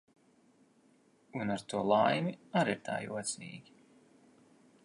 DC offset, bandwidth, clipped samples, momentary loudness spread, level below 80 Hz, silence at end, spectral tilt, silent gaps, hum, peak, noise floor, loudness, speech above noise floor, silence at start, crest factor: under 0.1%; 11.5 kHz; under 0.1%; 16 LU; -74 dBFS; 1.25 s; -5 dB/octave; none; none; -14 dBFS; -67 dBFS; -33 LUFS; 34 dB; 1.35 s; 22 dB